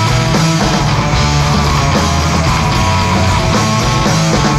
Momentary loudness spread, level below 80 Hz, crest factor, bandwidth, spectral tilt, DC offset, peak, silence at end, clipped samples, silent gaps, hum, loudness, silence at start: 1 LU; -22 dBFS; 10 dB; 15.5 kHz; -4.5 dB/octave; under 0.1%; -2 dBFS; 0 s; under 0.1%; none; none; -12 LUFS; 0 s